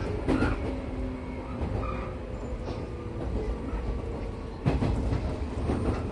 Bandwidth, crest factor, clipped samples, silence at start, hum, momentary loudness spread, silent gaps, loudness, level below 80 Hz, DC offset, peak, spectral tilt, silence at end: 11 kHz; 18 dB; under 0.1%; 0 s; none; 9 LU; none; -32 LUFS; -34 dBFS; under 0.1%; -12 dBFS; -8 dB/octave; 0 s